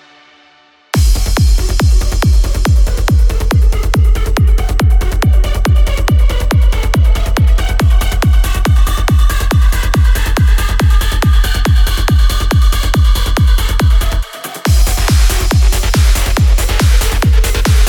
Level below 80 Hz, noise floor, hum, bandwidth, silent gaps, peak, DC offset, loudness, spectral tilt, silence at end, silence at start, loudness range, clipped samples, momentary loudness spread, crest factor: -10 dBFS; -47 dBFS; none; 18 kHz; none; 0 dBFS; under 0.1%; -13 LUFS; -5 dB/octave; 0 s; 0.95 s; 1 LU; under 0.1%; 1 LU; 10 dB